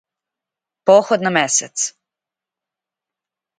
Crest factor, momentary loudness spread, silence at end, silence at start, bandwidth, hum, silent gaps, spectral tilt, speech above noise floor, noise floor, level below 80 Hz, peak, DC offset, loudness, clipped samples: 20 dB; 9 LU; 1.7 s; 0.85 s; 9.6 kHz; none; none; -2.5 dB/octave; 72 dB; -87 dBFS; -70 dBFS; 0 dBFS; under 0.1%; -16 LUFS; under 0.1%